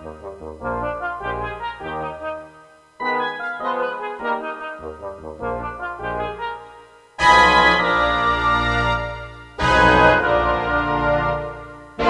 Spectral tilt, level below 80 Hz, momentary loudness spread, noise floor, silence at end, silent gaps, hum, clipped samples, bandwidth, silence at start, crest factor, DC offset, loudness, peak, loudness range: -5 dB/octave; -36 dBFS; 20 LU; -48 dBFS; 0 s; none; none; under 0.1%; 11.5 kHz; 0 s; 20 dB; under 0.1%; -19 LUFS; 0 dBFS; 11 LU